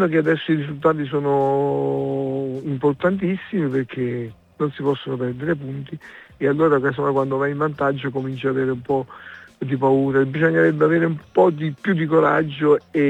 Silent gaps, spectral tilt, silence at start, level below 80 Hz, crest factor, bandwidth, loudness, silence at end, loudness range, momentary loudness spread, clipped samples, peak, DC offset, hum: none; -9 dB/octave; 0 s; -60 dBFS; 18 dB; 8.2 kHz; -20 LUFS; 0 s; 5 LU; 9 LU; under 0.1%; -4 dBFS; under 0.1%; none